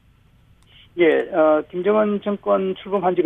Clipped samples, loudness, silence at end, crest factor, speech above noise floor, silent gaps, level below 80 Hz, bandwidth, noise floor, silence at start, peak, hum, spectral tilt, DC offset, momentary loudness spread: under 0.1%; -19 LUFS; 0 s; 14 dB; 36 dB; none; -58 dBFS; 3.9 kHz; -54 dBFS; 0.95 s; -6 dBFS; none; -8.5 dB/octave; under 0.1%; 6 LU